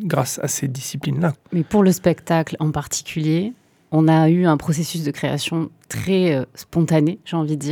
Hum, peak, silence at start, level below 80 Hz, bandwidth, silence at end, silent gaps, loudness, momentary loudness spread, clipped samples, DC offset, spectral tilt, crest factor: none; -4 dBFS; 0 s; -52 dBFS; 18 kHz; 0 s; none; -20 LUFS; 9 LU; under 0.1%; under 0.1%; -6 dB/octave; 16 dB